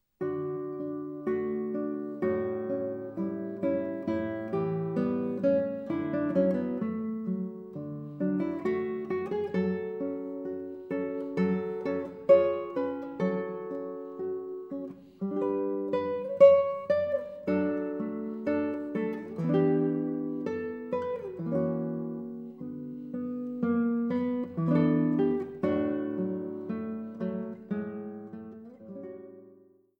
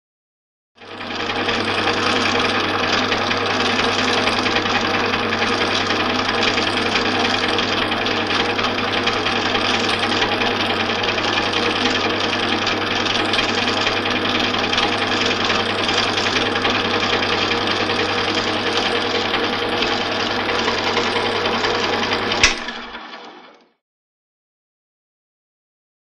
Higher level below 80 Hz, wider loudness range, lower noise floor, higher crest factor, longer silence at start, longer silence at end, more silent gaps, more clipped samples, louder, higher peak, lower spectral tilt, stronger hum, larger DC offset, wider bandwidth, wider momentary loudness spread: second, -70 dBFS vs -46 dBFS; first, 7 LU vs 2 LU; first, -59 dBFS vs -45 dBFS; about the same, 22 dB vs 20 dB; second, 0.2 s vs 0.8 s; second, 0.45 s vs 2.55 s; neither; neither; second, -30 LUFS vs -18 LUFS; second, -8 dBFS vs 0 dBFS; first, -10 dB/octave vs -3 dB/octave; neither; neither; second, 6 kHz vs 14.5 kHz; first, 13 LU vs 2 LU